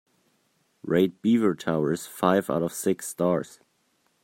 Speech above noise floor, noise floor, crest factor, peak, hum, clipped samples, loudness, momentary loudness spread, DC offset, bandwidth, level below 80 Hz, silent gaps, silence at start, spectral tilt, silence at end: 45 dB; -70 dBFS; 20 dB; -6 dBFS; none; under 0.1%; -25 LUFS; 6 LU; under 0.1%; 16.5 kHz; -66 dBFS; none; 0.85 s; -6 dB/octave; 0.75 s